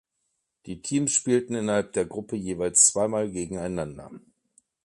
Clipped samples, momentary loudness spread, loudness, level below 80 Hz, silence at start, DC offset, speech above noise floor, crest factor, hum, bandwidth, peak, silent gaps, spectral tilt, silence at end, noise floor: under 0.1%; 17 LU; -24 LUFS; -56 dBFS; 0.65 s; under 0.1%; 52 dB; 24 dB; none; 11.5 kHz; -4 dBFS; none; -3.5 dB/octave; 0.65 s; -78 dBFS